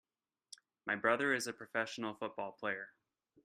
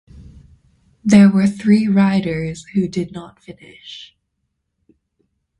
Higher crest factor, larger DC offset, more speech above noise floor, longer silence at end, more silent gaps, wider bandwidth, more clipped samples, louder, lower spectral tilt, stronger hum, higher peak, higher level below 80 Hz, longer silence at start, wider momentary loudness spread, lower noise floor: first, 24 dB vs 18 dB; neither; second, 23 dB vs 57 dB; second, 0.55 s vs 1.55 s; neither; first, 14.5 kHz vs 10.5 kHz; neither; second, -38 LUFS vs -15 LUFS; second, -3.5 dB/octave vs -7 dB/octave; neither; second, -16 dBFS vs 0 dBFS; second, -84 dBFS vs -50 dBFS; first, 0.85 s vs 0.2 s; about the same, 22 LU vs 24 LU; second, -61 dBFS vs -73 dBFS